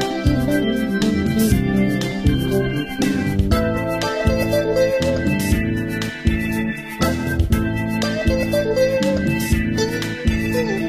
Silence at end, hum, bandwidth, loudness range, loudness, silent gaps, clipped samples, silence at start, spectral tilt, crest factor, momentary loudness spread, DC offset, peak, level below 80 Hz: 0 s; none; 16 kHz; 2 LU; -19 LUFS; none; under 0.1%; 0 s; -6 dB/octave; 16 dB; 4 LU; under 0.1%; -4 dBFS; -28 dBFS